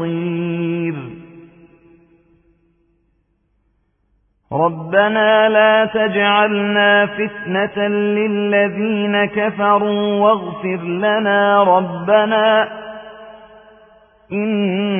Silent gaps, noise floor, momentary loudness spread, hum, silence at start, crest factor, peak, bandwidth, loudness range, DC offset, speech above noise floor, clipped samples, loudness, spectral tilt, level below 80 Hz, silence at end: none; -63 dBFS; 11 LU; none; 0 s; 16 dB; -2 dBFS; 3.6 kHz; 12 LU; under 0.1%; 48 dB; under 0.1%; -16 LUFS; -11 dB/octave; -60 dBFS; 0 s